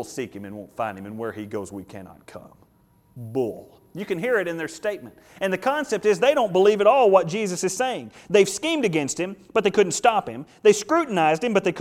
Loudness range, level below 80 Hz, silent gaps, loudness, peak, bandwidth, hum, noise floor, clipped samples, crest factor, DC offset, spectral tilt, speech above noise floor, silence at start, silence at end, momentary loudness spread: 13 LU; -64 dBFS; none; -22 LUFS; -2 dBFS; 16 kHz; none; -59 dBFS; under 0.1%; 20 dB; under 0.1%; -4 dB/octave; 37 dB; 0 s; 0 s; 18 LU